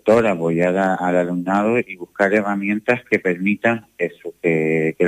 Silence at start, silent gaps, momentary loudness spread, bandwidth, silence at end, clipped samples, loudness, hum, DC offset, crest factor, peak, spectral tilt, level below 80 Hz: 0.05 s; none; 6 LU; 14.5 kHz; 0 s; under 0.1%; -19 LUFS; none; under 0.1%; 16 dB; -2 dBFS; -7.5 dB/octave; -58 dBFS